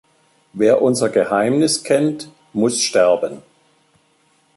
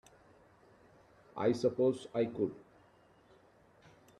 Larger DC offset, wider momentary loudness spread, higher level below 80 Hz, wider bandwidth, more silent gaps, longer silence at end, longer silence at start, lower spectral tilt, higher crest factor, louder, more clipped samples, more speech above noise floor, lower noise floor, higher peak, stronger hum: neither; about the same, 12 LU vs 14 LU; first, -62 dBFS vs -74 dBFS; about the same, 12 kHz vs 11.5 kHz; neither; second, 1.15 s vs 1.6 s; second, 0.55 s vs 1.35 s; second, -4 dB/octave vs -7 dB/octave; about the same, 16 dB vs 20 dB; first, -17 LUFS vs -34 LUFS; neither; first, 43 dB vs 32 dB; second, -59 dBFS vs -65 dBFS; first, -2 dBFS vs -18 dBFS; neither